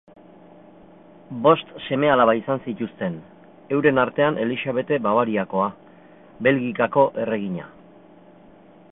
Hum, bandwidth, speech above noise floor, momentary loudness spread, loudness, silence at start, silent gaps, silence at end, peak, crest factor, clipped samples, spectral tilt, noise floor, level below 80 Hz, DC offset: none; 4 kHz; 28 dB; 11 LU; -21 LUFS; 1.3 s; none; 1.25 s; -4 dBFS; 20 dB; under 0.1%; -11 dB/octave; -49 dBFS; -62 dBFS; under 0.1%